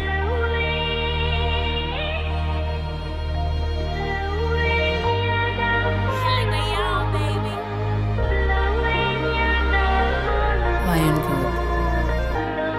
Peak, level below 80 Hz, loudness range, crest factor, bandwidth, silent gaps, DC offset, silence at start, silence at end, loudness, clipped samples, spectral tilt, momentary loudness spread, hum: -8 dBFS; -26 dBFS; 4 LU; 14 dB; 14.5 kHz; none; under 0.1%; 0 s; 0 s; -22 LUFS; under 0.1%; -6 dB/octave; 5 LU; none